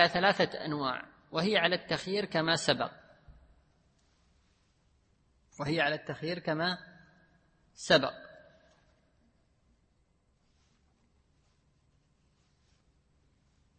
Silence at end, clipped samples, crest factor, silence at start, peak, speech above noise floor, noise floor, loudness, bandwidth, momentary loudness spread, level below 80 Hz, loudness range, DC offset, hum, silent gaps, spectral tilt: 5.45 s; under 0.1%; 28 dB; 0 s; -8 dBFS; 41 dB; -72 dBFS; -31 LUFS; 8.4 kHz; 12 LU; -68 dBFS; 7 LU; under 0.1%; none; none; -4 dB/octave